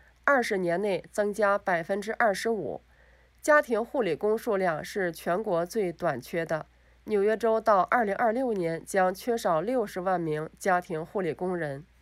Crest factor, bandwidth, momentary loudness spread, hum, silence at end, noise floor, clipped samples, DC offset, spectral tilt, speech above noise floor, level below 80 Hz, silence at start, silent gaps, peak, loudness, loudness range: 22 dB; 16 kHz; 9 LU; none; 0.2 s; -59 dBFS; under 0.1%; under 0.1%; -5.5 dB/octave; 32 dB; -62 dBFS; 0.25 s; none; -6 dBFS; -28 LUFS; 3 LU